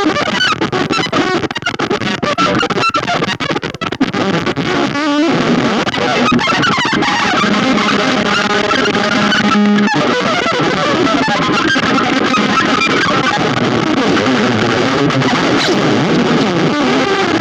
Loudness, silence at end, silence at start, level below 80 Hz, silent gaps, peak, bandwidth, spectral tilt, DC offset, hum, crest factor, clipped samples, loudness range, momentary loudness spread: -13 LUFS; 0 s; 0 s; -44 dBFS; none; 0 dBFS; 11.5 kHz; -4.5 dB/octave; under 0.1%; none; 12 dB; under 0.1%; 3 LU; 4 LU